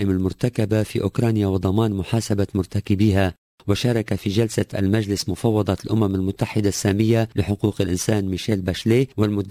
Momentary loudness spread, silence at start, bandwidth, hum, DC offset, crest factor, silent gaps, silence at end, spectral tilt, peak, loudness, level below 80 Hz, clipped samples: 4 LU; 0 s; 16 kHz; none; under 0.1%; 14 dB; 3.38-3.58 s; 0 s; -6.5 dB/octave; -6 dBFS; -21 LUFS; -38 dBFS; under 0.1%